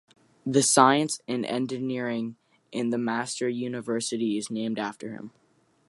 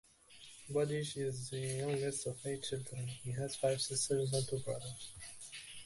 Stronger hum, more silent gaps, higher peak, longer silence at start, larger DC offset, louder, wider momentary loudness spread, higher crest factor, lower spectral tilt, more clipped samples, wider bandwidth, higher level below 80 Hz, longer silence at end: neither; neither; first, -4 dBFS vs -22 dBFS; first, 0.45 s vs 0.3 s; neither; first, -26 LUFS vs -39 LUFS; first, 18 LU vs 14 LU; first, 24 dB vs 18 dB; about the same, -3.5 dB/octave vs -4 dB/octave; neither; about the same, 11.5 kHz vs 12 kHz; second, -76 dBFS vs -68 dBFS; first, 0.6 s vs 0 s